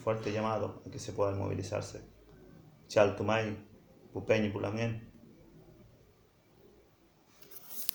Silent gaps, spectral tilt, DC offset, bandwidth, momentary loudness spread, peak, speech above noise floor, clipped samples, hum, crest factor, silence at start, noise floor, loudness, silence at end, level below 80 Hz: none; -5.5 dB/octave; under 0.1%; over 20 kHz; 17 LU; -6 dBFS; 32 dB; under 0.1%; none; 30 dB; 0 s; -65 dBFS; -34 LUFS; 0 s; -64 dBFS